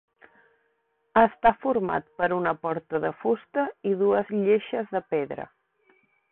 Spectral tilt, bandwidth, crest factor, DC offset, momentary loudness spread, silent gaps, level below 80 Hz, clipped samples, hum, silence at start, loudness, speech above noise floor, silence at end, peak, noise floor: -10.5 dB/octave; 4.1 kHz; 20 dB; under 0.1%; 8 LU; none; -60 dBFS; under 0.1%; none; 1.15 s; -25 LUFS; 47 dB; 0.85 s; -6 dBFS; -72 dBFS